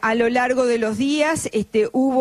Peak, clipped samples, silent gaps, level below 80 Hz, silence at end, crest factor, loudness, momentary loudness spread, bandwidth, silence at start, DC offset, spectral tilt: -6 dBFS; under 0.1%; none; -54 dBFS; 0 s; 12 dB; -20 LUFS; 3 LU; 14 kHz; 0 s; under 0.1%; -4 dB/octave